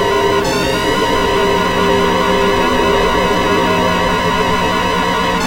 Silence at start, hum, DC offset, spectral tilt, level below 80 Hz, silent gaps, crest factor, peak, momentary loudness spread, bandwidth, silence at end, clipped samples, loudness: 0 s; none; under 0.1%; -4.5 dB/octave; -30 dBFS; none; 12 dB; 0 dBFS; 2 LU; 16 kHz; 0 s; under 0.1%; -13 LUFS